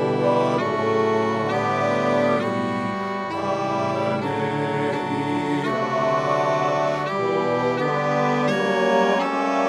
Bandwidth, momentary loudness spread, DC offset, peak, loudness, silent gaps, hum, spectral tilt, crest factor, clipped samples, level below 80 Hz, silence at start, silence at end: 11.5 kHz; 4 LU; under 0.1%; -6 dBFS; -22 LUFS; none; none; -6 dB/octave; 14 dB; under 0.1%; -62 dBFS; 0 s; 0 s